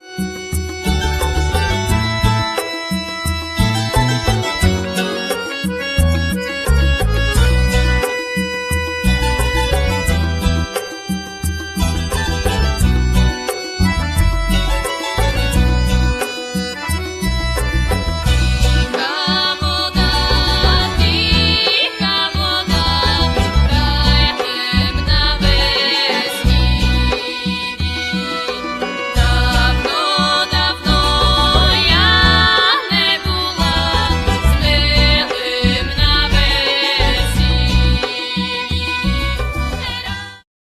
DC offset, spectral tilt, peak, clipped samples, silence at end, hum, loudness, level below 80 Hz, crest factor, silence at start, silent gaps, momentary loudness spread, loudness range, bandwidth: under 0.1%; -4.5 dB/octave; 0 dBFS; under 0.1%; 0.4 s; none; -15 LUFS; -20 dBFS; 16 dB; 0.05 s; none; 8 LU; 6 LU; 14 kHz